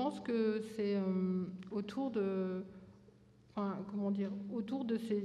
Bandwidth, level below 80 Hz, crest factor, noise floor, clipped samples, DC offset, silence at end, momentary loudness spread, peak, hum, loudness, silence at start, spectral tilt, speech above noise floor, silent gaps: 11 kHz; -76 dBFS; 14 dB; -63 dBFS; under 0.1%; under 0.1%; 0 s; 7 LU; -24 dBFS; none; -38 LUFS; 0 s; -8 dB/octave; 26 dB; none